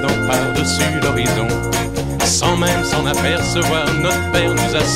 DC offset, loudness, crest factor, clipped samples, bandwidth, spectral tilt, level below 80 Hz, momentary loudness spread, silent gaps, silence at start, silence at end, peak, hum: 0.7%; -16 LUFS; 14 dB; under 0.1%; 16.5 kHz; -4 dB/octave; -32 dBFS; 3 LU; none; 0 s; 0 s; -2 dBFS; none